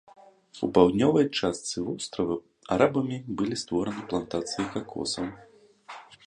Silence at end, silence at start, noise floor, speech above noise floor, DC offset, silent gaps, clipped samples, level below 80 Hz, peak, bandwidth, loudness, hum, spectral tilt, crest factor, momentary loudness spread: 0.15 s; 0.55 s; -48 dBFS; 21 dB; under 0.1%; none; under 0.1%; -58 dBFS; -6 dBFS; 10.5 kHz; -27 LUFS; none; -5 dB/octave; 22 dB; 12 LU